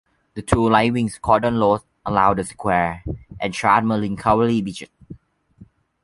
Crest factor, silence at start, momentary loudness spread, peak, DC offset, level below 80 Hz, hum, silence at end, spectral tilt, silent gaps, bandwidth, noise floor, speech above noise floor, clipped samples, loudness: 18 dB; 0.35 s; 15 LU; -2 dBFS; under 0.1%; -40 dBFS; none; 0.4 s; -6 dB/octave; none; 11.5 kHz; -50 dBFS; 31 dB; under 0.1%; -19 LUFS